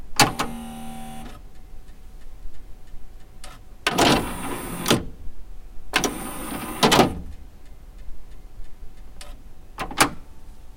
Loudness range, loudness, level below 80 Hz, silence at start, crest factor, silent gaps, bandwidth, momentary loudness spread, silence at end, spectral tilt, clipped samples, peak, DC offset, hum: 8 LU; -22 LUFS; -40 dBFS; 0 s; 26 dB; none; 17 kHz; 26 LU; 0 s; -3 dB/octave; under 0.1%; 0 dBFS; under 0.1%; none